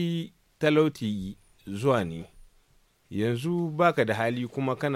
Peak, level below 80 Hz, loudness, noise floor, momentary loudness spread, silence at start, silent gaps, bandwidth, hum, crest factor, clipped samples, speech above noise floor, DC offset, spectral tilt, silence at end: -8 dBFS; -58 dBFS; -27 LUFS; -64 dBFS; 16 LU; 0 s; none; 16 kHz; none; 20 dB; under 0.1%; 37 dB; under 0.1%; -7 dB/octave; 0 s